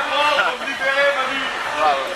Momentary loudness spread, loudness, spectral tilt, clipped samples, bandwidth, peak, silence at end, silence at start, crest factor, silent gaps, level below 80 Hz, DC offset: 5 LU; -18 LUFS; -1.5 dB/octave; under 0.1%; 14 kHz; -4 dBFS; 0 s; 0 s; 16 dB; none; -56 dBFS; under 0.1%